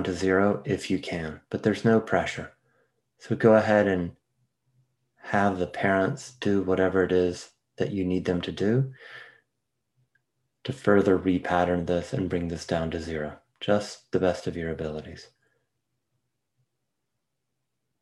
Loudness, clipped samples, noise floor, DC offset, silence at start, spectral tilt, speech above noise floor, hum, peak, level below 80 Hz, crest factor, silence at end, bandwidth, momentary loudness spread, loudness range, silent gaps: -26 LUFS; under 0.1%; -82 dBFS; under 0.1%; 0 s; -6.5 dB/octave; 57 dB; none; -6 dBFS; -60 dBFS; 22 dB; 2.75 s; 12 kHz; 14 LU; 6 LU; none